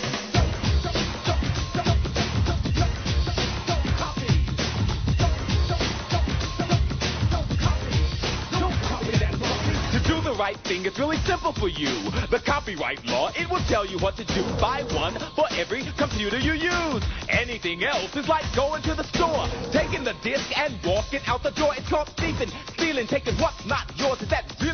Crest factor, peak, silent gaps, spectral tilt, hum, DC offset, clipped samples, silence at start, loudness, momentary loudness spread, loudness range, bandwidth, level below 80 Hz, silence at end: 18 dB; -8 dBFS; none; -5 dB/octave; none; under 0.1%; under 0.1%; 0 s; -25 LUFS; 3 LU; 1 LU; 6.6 kHz; -32 dBFS; 0 s